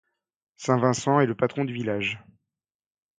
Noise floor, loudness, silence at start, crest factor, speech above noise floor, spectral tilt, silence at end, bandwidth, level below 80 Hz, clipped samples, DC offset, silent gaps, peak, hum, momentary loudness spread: -89 dBFS; -25 LUFS; 0.6 s; 22 dB; 65 dB; -5.5 dB/octave; 1 s; 9.6 kHz; -64 dBFS; under 0.1%; under 0.1%; none; -6 dBFS; none; 9 LU